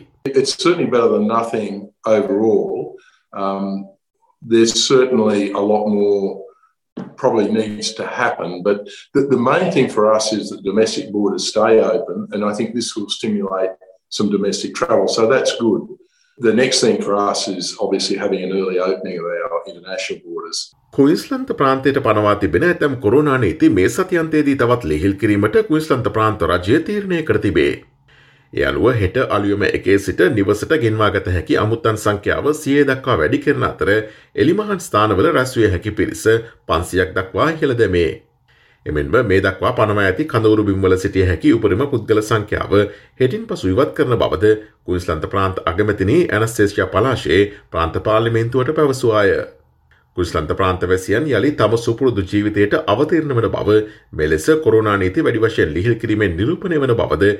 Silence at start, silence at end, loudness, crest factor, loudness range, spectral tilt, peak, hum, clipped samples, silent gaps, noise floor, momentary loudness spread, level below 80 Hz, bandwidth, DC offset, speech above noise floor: 0.25 s; 0 s; -17 LUFS; 14 dB; 3 LU; -5.5 dB/octave; -2 dBFS; none; under 0.1%; 6.92-6.96 s; -55 dBFS; 8 LU; -44 dBFS; 14.5 kHz; under 0.1%; 39 dB